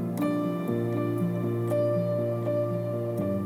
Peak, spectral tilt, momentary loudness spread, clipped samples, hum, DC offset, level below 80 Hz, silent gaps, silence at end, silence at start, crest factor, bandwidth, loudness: -16 dBFS; -9 dB/octave; 3 LU; under 0.1%; none; under 0.1%; -72 dBFS; none; 0 s; 0 s; 12 dB; 16 kHz; -28 LUFS